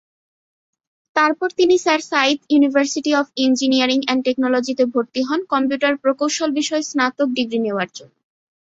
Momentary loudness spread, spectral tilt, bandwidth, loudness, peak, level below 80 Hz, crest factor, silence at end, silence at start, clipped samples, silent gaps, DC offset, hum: 5 LU; -2.5 dB/octave; 8 kHz; -18 LUFS; -2 dBFS; -66 dBFS; 18 dB; 0.6 s; 1.15 s; under 0.1%; none; under 0.1%; none